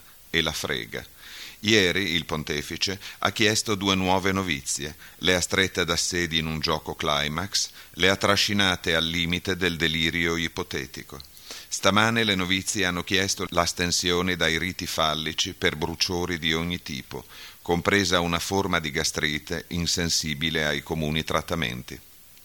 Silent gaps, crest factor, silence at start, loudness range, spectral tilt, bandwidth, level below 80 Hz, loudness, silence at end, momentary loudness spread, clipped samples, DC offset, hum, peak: none; 22 dB; 0.1 s; 2 LU; -3 dB/octave; over 20 kHz; -48 dBFS; -24 LUFS; 0.45 s; 11 LU; under 0.1%; under 0.1%; none; -4 dBFS